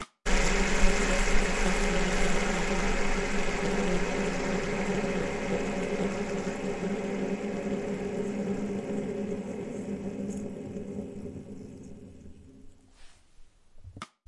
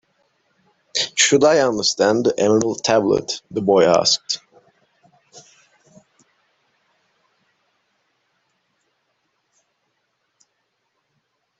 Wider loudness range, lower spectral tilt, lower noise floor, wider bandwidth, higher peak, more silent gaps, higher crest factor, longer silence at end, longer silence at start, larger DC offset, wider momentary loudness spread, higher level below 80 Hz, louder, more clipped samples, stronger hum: first, 13 LU vs 7 LU; first, -4.5 dB/octave vs -3 dB/octave; second, -53 dBFS vs -72 dBFS; first, 11.5 kHz vs 8.2 kHz; second, -8 dBFS vs -2 dBFS; neither; about the same, 22 dB vs 20 dB; second, 0.2 s vs 6.2 s; second, 0 s vs 0.95 s; neither; first, 14 LU vs 10 LU; first, -34 dBFS vs -62 dBFS; second, -31 LUFS vs -17 LUFS; neither; neither